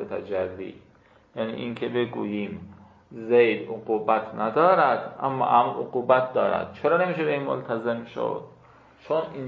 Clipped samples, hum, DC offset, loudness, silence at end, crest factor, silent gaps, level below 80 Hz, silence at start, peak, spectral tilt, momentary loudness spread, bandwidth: under 0.1%; none; under 0.1%; -25 LUFS; 0 s; 20 dB; none; -62 dBFS; 0 s; -4 dBFS; -8.5 dB/octave; 13 LU; 5.2 kHz